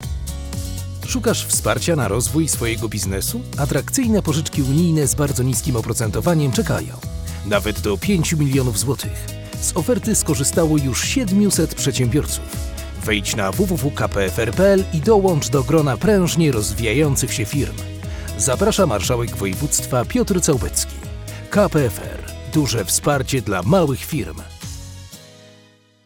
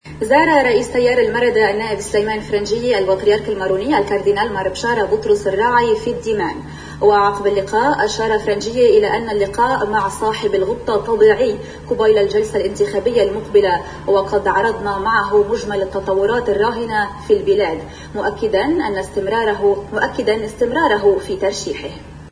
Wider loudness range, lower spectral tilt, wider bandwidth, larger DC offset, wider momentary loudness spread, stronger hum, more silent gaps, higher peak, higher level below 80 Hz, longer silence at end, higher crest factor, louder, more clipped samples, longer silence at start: about the same, 3 LU vs 2 LU; about the same, -5 dB/octave vs -4.5 dB/octave; first, 17.5 kHz vs 10.5 kHz; neither; first, 12 LU vs 7 LU; neither; neither; about the same, -2 dBFS vs 0 dBFS; first, -34 dBFS vs -40 dBFS; first, 0.55 s vs 0 s; about the same, 18 dB vs 16 dB; second, -19 LUFS vs -16 LUFS; neither; about the same, 0 s vs 0.05 s